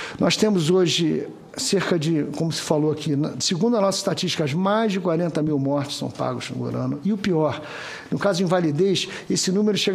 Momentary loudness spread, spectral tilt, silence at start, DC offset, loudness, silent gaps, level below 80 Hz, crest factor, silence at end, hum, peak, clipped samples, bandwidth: 8 LU; -5 dB/octave; 0 s; under 0.1%; -22 LUFS; none; -60 dBFS; 18 dB; 0 s; none; -4 dBFS; under 0.1%; 15 kHz